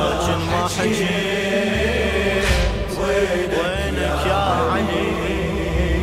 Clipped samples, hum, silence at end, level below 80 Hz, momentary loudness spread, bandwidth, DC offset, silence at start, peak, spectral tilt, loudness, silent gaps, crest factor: under 0.1%; none; 0 s; -28 dBFS; 3 LU; 16 kHz; under 0.1%; 0 s; -4 dBFS; -5 dB/octave; -20 LUFS; none; 14 dB